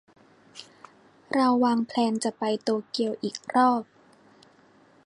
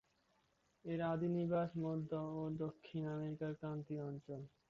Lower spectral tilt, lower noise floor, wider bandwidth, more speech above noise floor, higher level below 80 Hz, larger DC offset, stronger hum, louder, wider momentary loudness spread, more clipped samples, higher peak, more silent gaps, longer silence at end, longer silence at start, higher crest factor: second, -4.5 dB/octave vs -8 dB/octave; second, -58 dBFS vs -79 dBFS; first, 10.5 kHz vs 7 kHz; second, 33 dB vs 37 dB; about the same, -78 dBFS vs -74 dBFS; neither; neither; first, -25 LUFS vs -43 LUFS; first, 22 LU vs 8 LU; neither; first, -10 dBFS vs -28 dBFS; neither; first, 1.25 s vs 0.25 s; second, 0.55 s vs 0.85 s; about the same, 16 dB vs 14 dB